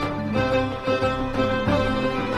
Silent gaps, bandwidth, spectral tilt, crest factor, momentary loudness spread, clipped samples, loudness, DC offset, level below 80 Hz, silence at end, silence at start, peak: none; 12 kHz; -6.5 dB/octave; 14 dB; 2 LU; under 0.1%; -23 LUFS; under 0.1%; -38 dBFS; 0 s; 0 s; -10 dBFS